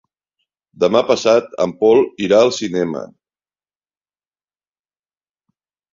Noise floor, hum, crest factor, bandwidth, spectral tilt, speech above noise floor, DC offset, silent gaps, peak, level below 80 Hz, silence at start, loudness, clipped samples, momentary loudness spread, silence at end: under -90 dBFS; none; 18 dB; 7.6 kHz; -5 dB/octave; over 75 dB; under 0.1%; none; -2 dBFS; -60 dBFS; 0.8 s; -15 LUFS; under 0.1%; 8 LU; 2.9 s